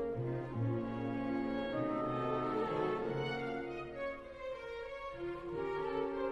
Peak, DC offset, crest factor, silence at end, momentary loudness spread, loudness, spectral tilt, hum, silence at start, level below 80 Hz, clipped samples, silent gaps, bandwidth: -24 dBFS; under 0.1%; 14 dB; 0 s; 8 LU; -39 LUFS; -8 dB/octave; none; 0 s; -62 dBFS; under 0.1%; none; 9.8 kHz